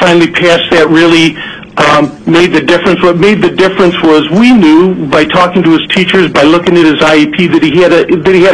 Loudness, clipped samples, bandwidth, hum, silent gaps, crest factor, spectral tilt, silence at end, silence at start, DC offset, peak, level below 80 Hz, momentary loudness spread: -6 LUFS; 2%; 11 kHz; none; none; 6 dB; -5.5 dB/octave; 0 s; 0 s; under 0.1%; 0 dBFS; -38 dBFS; 3 LU